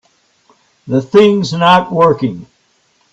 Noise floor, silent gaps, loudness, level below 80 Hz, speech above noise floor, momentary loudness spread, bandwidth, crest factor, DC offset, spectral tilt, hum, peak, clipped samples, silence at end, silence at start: -57 dBFS; none; -11 LUFS; -52 dBFS; 46 dB; 10 LU; 8.2 kHz; 14 dB; under 0.1%; -6.5 dB/octave; none; 0 dBFS; under 0.1%; 0.7 s; 0.85 s